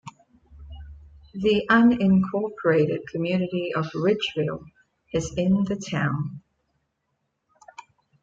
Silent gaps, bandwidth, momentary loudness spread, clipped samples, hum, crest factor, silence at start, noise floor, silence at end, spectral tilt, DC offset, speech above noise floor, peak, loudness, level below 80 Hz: none; 7.8 kHz; 15 LU; under 0.1%; none; 18 dB; 0.05 s; -76 dBFS; 1.85 s; -6.5 dB/octave; under 0.1%; 54 dB; -6 dBFS; -23 LUFS; -52 dBFS